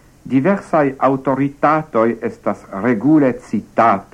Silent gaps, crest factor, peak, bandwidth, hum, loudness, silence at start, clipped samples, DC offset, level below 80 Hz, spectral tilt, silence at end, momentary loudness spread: none; 16 dB; 0 dBFS; 10 kHz; none; -17 LUFS; 0.25 s; under 0.1%; under 0.1%; -52 dBFS; -8.5 dB/octave; 0.1 s; 9 LU